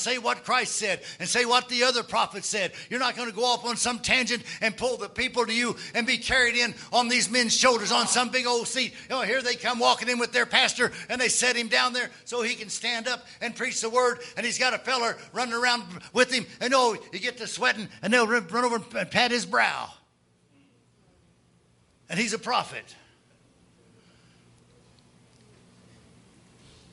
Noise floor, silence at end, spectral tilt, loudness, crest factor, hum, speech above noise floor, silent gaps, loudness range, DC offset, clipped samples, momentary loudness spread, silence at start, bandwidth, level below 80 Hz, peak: -65 dBFS; 4 s; -1.5 dB/octave; -25 LUFS; 24 dB; none; 39 dB; none; 10 LU; under 0.1%; under 0.1%; 8 LU; 0 s; 11.5 kHz; -62 dBFS; -4 dBFS